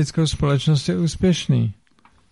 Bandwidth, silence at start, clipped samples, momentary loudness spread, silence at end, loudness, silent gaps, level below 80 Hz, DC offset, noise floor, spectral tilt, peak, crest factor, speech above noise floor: 11.5 kHz; 0 s; under 0.1%; 4 LU; 0.6 s; -20 LUFS; none; -40 dBFS; under 0.1%; -57 dBFS; -6 dB/octave; -6 dBFS; 14 dB; 38 dB